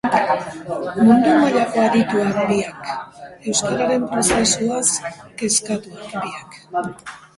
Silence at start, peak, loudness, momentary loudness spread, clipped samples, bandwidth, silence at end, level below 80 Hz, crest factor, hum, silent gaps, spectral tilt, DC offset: 0.05 s; -2 dBFS; -18 LUFS; 16 LU; under 0.1%; 11.5 kHz; 0.2 s; -50 dBFS; 18 dB; none; none; -3.5 dB/octave; under 0.1%